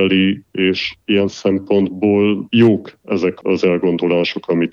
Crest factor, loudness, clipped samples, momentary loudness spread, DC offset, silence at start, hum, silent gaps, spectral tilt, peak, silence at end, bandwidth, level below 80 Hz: 14 dB; -16 LUFS; under 0.1%; 6 LU; under 0.1%; 0 s; none; none; -7 dB/octave; -2 dBFS; 0.05 s; 7.2 kHz; -58 dBFS